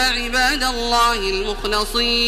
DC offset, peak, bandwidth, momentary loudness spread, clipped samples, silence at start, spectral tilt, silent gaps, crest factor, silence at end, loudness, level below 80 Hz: under 0.1%; -6 dBFS; 15.5 kHz; 5 LU; under 0.1%; 0 s; -1.5 dB/octave; none; 14 dB; 0 s; -18 LUFS; -30 dBFS